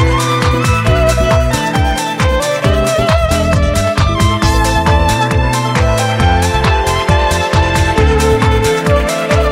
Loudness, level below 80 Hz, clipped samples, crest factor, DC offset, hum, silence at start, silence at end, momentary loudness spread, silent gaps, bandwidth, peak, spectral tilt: -12 LUFS; -18 dBFS; under 0.1%; 12 dB; under 0.1%; none; 0 s; 0 s; 2 LU; none; 16 kHz; 0 dBFS; -5 dB/octave